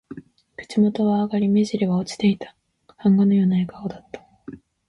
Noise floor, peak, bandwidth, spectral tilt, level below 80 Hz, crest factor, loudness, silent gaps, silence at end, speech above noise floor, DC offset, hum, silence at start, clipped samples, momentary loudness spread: -43 dBFS; -8 dBFS; 10.5 kHz; -7.5 dB/octave; -60 dBFS; 14 dB; -21 LUFS; none; 0.3 s; 24 dB; under 0.1%; none; 0.1 s; under 0.1%; 23 LU